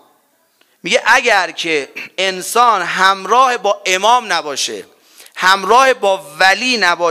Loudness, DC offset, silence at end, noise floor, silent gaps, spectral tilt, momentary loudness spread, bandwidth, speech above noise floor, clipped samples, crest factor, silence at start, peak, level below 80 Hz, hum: -13 LUFS; under 0.1%; 0 s; -57 dBFS; none; -1 dB/octave; 9 LU; 16.5 kHz; 44 dB; 0.1%; 14 dB; 0.85 s; 0 dBFS; -58 dBFS; none